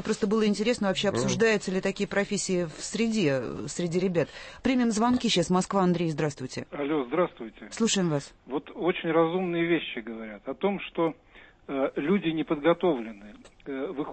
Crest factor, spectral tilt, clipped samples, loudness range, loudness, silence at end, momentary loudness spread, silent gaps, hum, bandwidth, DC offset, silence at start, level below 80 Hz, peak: 18 dB; -5 dB/octave; under 0.1%; 3 LU; -27 LUFS; 0 s; 11 LU; none; none; 8.8 kHz; under 0.1%; 0 s; -56 dBFS; -10 dBFS